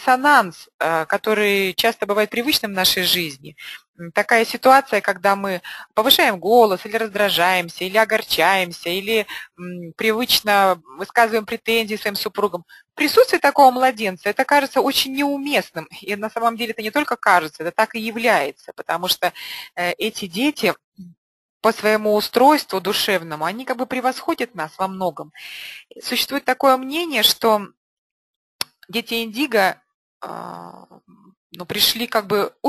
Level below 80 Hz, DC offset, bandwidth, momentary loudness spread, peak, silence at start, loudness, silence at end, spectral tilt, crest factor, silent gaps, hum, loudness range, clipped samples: -62 dBFS; under 0.1%; 13 kHz; 16 LU; 0 dBFS; 0 s; -18 LUFS; 0 s; -2.5 dB/octave; 20 dB; 0.74-0.79 s, 3.88-3.94 s, 20.84-20.92 s, 21.18-21.60 s, 27.77-28.59 s, 29.94-30.21 s, 31.37-31.50 s; none; 6 LU; under 0.1%